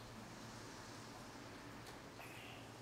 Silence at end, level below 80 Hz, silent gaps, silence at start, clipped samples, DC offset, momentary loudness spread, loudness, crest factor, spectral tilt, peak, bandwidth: 0 s; -70 dBFS; none; 0 s; under 0.1%; under 0.1%; 1 LU; -54 LUFS; 14 dB; -4 dB/octave; -40 dBFS; 16 kHz